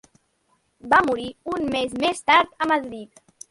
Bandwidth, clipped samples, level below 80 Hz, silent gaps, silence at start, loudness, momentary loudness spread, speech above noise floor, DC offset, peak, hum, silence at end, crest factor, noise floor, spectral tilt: 11.5 kHz; under 0.1%; -56 dBFS; none; 0.85 s; -21 LUFS; 11 LU; 46 dB; under 0.1%; -2 dBFS; none; 0.45 s; 20 dB; -67 dBFS; -3.5 dB/octave